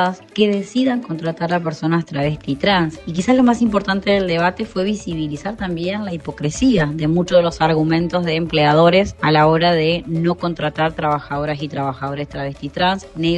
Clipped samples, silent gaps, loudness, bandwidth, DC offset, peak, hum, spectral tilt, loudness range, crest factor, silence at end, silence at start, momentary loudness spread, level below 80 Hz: under 0.1%; none; -18 LUFS; 9.4 kHz; under 0.1%; 0 dBFS; none; -6 dB/octave; 5 LU; 16 dB; 0 s; 0 s; 10 LU; -42 dBFS